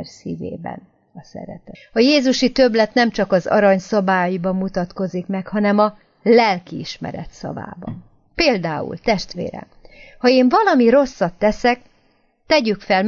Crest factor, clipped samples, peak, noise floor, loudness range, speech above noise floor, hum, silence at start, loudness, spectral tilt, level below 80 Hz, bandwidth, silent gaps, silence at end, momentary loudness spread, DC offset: 16 dB; under 0.1%; -2 dBFS; -59 dBFS; 5 LU; 42 dB; none; 0 s; -17 LUFS; -5.5 dB/octave; -46 dBFS; 7.4 kHz; none; 0 s; 19 LU; under 0.1%